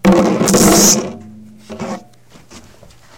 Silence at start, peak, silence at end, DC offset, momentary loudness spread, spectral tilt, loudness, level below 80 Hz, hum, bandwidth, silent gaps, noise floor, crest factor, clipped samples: 0.05 s; 0 dBFS; 0.6 s; under 0.1%; 24 LU; -3.5 dB/octave; -10 LUFS; -40 dBFS; none; 17.5 kHz; none; -44 dBFS; 14 dB; under 0.1%